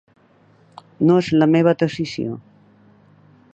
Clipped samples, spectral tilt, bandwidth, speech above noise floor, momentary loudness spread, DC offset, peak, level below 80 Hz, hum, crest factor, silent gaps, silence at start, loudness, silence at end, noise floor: under 0.1%; -7.5 dB/octave; 8 kHz; 37 dB; 13 LU; under 0.1%; -4 dBFS; -60 dBFS; none; 18 dB; none; 1 s; -18 LUFS; 1.15 s; -54 dBFS